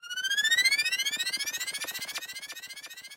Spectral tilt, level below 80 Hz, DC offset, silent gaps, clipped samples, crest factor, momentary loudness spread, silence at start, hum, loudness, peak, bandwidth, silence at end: 3 dB/octave; -80 dBFS; under 0.1%; none; under 0.1%; 20 dB; 17 LU; 0.05 s; none; -27 LUFS; -12 dBFS; 16 kHz; 0 s